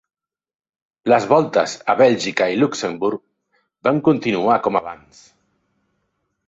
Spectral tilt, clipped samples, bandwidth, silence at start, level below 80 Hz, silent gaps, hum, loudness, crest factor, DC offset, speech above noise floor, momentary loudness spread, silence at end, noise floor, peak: -5.5 dB/octave; under 0.1%; 8 kHz; 1.05 s; -62 dBFS; none; none; -18 LUFS; 18 dB; under 0.1%; 54 dB; 9 LU; 1.5 s; -72 dBFS; -2 dBFS